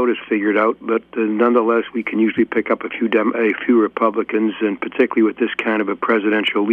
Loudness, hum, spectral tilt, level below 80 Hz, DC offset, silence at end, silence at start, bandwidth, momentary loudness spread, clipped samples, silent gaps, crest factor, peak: -18 LUFS; none; -7.5 dB/octave; -64 dBFS; under 0.1%; 0 s; 0 s; 3.9 kHz; 5 LU; under 0.1%; none; 16 dB; -2 dBFS